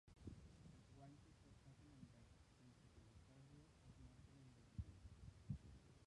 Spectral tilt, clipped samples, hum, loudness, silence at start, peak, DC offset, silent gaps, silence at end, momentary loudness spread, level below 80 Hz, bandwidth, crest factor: -6.5 dB/octave; under 0.1%; none; -63 LUFS; 0.05 s; -38 dBFS; under 0.1%; none; 0 s; 12 LU; -68 dBFS; 11 kHz; 24 dB